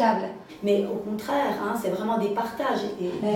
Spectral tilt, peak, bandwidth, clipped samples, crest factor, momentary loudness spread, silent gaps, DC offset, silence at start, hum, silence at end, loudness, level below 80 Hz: -6 dB/octave; -8 dBFS; 17.5 kHz; under 0.1%; 18 dB; 6 LU; none; under 0.1%; 0 s; none; 0 s; -27 LUFS; -64 dBFS